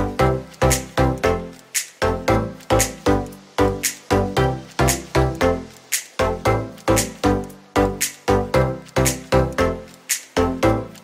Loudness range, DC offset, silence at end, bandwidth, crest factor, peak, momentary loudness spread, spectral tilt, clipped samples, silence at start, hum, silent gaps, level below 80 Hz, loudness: 1 LU; under 0.1%; 0.05 s; 16 kHz; 18 dB; -2 dBFS; 6 LU; -4.5 dB/octave; under 0.1%; 0 s; none; none; -32 dBFS; -21 LUFS